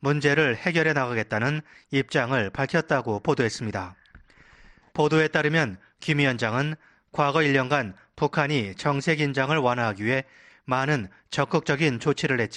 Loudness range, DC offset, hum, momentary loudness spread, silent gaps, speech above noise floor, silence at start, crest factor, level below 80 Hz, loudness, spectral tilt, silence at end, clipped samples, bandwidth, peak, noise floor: 2 LU; under 0.1%; none; 9 LU; none; 29 dB; 0 s; 18 dB; -58 dBFS; -24 LUFS; -5.5 dB/octave; 0 s; under 0.1%; 10.5 kHz; -6 dBFS; -53 dBFS